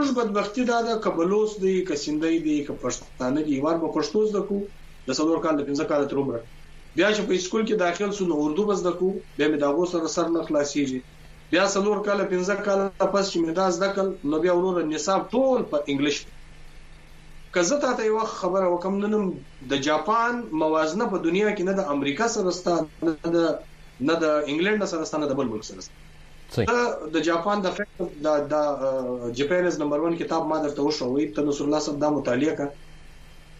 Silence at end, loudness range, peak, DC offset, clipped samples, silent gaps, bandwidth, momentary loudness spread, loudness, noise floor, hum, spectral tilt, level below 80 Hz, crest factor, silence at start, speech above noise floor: 0 s; 2 LU; -8 dBFS; under 0.1%; under 0.1%; none; 10.5 kHz; 6 LU; -24 LUFS; -45 dBFS; none; -5 dB/octave; -50 dBFS; 16 dB; 0 s; 21 dB